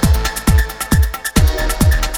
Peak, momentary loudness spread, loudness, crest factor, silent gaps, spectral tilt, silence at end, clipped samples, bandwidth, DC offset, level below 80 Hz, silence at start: 0 dBFS; 2 LU; -16 LUFS; 14 dB; none; -4.5 dB/octave; 0 s; under 0.1%; over 20 kHz; under 0.1%; -16 dBFS; 0 s